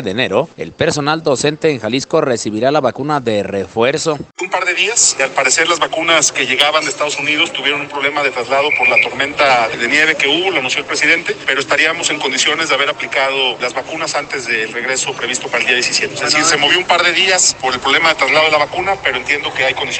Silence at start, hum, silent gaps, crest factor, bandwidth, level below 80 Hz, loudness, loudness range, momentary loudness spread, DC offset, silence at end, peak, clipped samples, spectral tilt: 0 s; none; none; 14 dB; 11 kHz; -54 dBFS; -13 LUFS; 4 LU; 7 LU; under 0.1%; 0 s; 0 dBFS; under 0.1%; -1.5 dB/octave